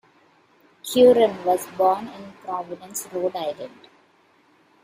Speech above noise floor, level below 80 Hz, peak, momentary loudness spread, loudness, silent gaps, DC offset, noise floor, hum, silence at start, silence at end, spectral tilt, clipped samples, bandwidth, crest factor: 38 dB; -68 dBFS; -4 dBFS; 22 LU; -21 LUFS; none; under 0.1%; -59 dBFS; none; 0.85 s; 1.15 s; -4 dB/octave; under 0.1%; 15.5 kHz; 20 dB